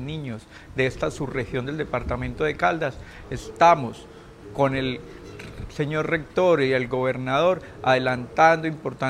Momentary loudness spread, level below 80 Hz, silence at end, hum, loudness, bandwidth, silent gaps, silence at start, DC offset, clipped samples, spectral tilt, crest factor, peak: 18 LU; -46 dBFS; 0 s; none; -23 LUFS; 13 kHz; none; 0 s; under 0.1%; under 0.1%; -6 dB/octave; 20 dB; -4 dBFS